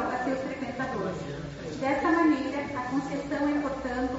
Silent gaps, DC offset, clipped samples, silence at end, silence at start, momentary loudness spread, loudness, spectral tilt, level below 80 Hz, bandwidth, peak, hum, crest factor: none; under 0.1%; under 0.1%; 0 s; 0 s; 11 LU; -29 LUFS; -5 dB/octave; -52 dBFS; 8 kHz; -12 dBFS; none; 16 dB